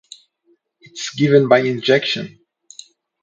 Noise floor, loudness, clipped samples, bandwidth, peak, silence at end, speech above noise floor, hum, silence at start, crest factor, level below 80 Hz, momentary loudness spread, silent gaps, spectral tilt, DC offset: -62 dBFS; -16 LUFS; under 0.1%; 8.8 kHz; 0 dBFS; 0.95 s; 46 dB; none; 0.95 s; 20 dB; -66 dBFS; 18 LU; none; -5 dB/octave; under 0.1%